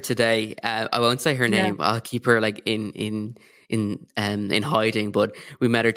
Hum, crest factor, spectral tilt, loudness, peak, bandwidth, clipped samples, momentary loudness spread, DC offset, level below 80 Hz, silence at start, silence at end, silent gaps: none; 20 dB; -5 dB/octave; -23 LUFS; -4 dBFS; 16.5 kHz; under 0.1%; 8 LU; under 0.1%; -64 dBFS; 0 s; 0 s; none